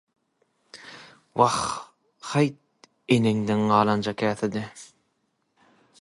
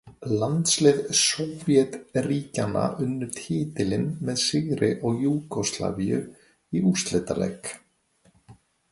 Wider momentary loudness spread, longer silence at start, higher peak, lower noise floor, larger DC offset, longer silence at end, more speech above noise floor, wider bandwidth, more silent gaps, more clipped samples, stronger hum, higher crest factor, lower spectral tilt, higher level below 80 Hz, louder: first, 23 LU vs 9 LU; first, 0.75 s vs 0.05 s; about the same, -4 dBFS vs -6 dBFS; first, -73 dBFS vs -63 dBFS; neither; first, 1.15 s vs 0.4 s; first, 50 dB vs 39 dB; about the same, 11.5 kHz vs 11.5 kHz; neither; neither; neither; about the same, 22 dB vs 20 dB; about the same, -5.5 dB/octave vs -4.5 dB/octave; second, -62 dBFS vs -56 dBFS; about the same, -24 LUFS vs -25 LUFS